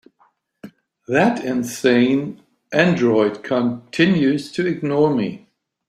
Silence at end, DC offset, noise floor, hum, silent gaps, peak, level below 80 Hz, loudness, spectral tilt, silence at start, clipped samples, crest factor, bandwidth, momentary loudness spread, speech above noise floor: 0.5 s; under 0.1%; -61 dBFS; none; none; 0 dBFS; -60 dBFS; -19 LUFS; -6 dB/octave; 0.65 s; under 0.1%; 18 dB; 15.5 kHz; 7 LU; 43 dB